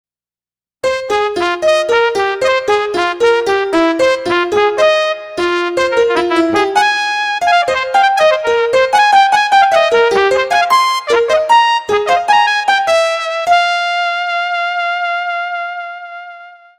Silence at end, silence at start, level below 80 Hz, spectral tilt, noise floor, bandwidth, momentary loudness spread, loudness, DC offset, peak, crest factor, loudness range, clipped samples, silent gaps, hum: 0.25 s; 0.85 s; -50 dBFS; -2.5 dB/octave; under -90 dBFS; 14.5 kHz; 8 LU; -12 LUFS; under 0.1%; 0 dBFS; 12 dB; 4 LU; under 0.1%; none; none